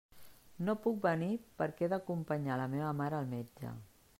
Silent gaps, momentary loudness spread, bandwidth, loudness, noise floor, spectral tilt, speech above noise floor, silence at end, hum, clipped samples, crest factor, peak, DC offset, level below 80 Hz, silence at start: none; 11 LU; 16 kHz; -37 LUFS; -56 dBFS; -8 dB/octave; 19 dB; 0.35 s; none; under 0.1%; 18 dB; -18 dBFS; under 0.1%; -70 dBFS; 0.15 s